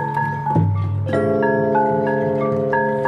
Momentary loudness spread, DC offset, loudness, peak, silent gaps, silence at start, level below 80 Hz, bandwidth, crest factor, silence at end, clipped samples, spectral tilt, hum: 4 LU; under 0.1%; -19 LUFS; -6 dBFS; none; 0 s; -54 dBFS; 9.6 kHz; 14 dB; 0 s; under 0.1%; -9.5 dB/octave; none